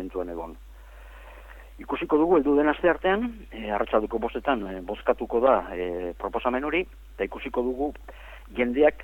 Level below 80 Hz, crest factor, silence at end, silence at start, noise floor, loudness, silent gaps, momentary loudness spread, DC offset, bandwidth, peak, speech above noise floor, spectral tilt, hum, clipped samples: -46 dBFS; 18 dB; 0 s; 0 s; -45 dBFS; -26 LUFS; none; 19 LU; under 0.1%; 17.5 kHz; -8 dBFS; 19 dB; -7 dB/octave; none; under 0.1%